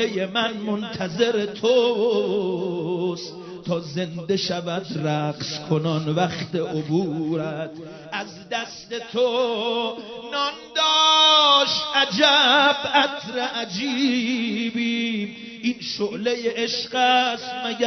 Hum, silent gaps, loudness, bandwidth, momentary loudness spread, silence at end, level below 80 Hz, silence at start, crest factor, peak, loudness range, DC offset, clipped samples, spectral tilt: none; none; -21 LUFS; 6.4 kHz; 14 LU; 0 s; -64 dBFS; 0 s; 20 dB; -2 dBFS; 10 LU; under 0.1%; under 0.1%; -4 dB/octave